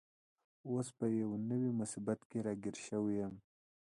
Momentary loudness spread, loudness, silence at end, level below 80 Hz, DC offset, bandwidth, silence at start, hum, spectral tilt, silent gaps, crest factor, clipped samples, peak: 6 LU; -40 LUFS; 0.6 s; -74 dBFS; under 0.1%; 11.5 kHz; 0.65 s; none; -7 dB/octave; 2.25-2.30 s; 18 dB; under 0.1%; -22 dBFS